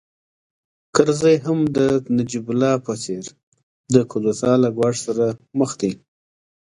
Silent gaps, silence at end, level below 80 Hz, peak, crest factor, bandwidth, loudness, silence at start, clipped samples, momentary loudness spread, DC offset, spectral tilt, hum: 3.43-3.52 s, 3.63-3.84 s; 0.7 s; -58 dBFS; 0 dBFS; 20 dB; 11 kHz; -20 LUFS; 0.95 s; under 0.1%; 10 LU; under 0.1%; -6 dB/octave; none